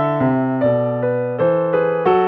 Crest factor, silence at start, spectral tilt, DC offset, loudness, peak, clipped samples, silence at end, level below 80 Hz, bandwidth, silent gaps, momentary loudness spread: 14 dB; 0 s; -10.5 dB/octave; under 0.1%; -18 LUFS; -4 dBFS; under 0.1%; 0 s; -56 dBFS; 4.8 kHz; none; 3 LU